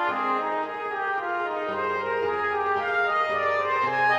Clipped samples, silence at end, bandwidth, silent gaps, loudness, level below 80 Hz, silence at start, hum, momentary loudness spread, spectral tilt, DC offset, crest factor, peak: under 0.1%; 0 s; 9.2 kHz; none; -25 LUFS; -68 dBFS; 0 s; none; 5 LU; -5 dB/octave; under 0.1%; 14 dB; -12 dBFS